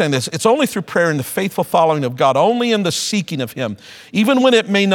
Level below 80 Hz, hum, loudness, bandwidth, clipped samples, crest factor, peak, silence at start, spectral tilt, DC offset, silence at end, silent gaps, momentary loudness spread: -62 dBFS; none; -16 LUFS; 19 kHz; under 0.1%; 16 dB; 0 dBFS; 0 s; -4.5 dB/octave; under 0.1%; 0 s; none; 10 LU